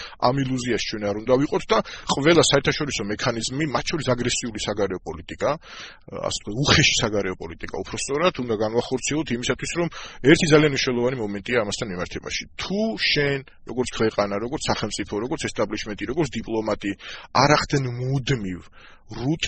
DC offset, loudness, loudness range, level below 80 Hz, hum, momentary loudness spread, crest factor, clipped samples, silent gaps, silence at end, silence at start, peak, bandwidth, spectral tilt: under 0.1%; -23 LUFS; 4 LU; -44 dBFS; none; 13 LU; 22 dB; under 0.1%; none; 0 s; 0 s; -2 dBFS; 8.8 kHz; -4 dB/octave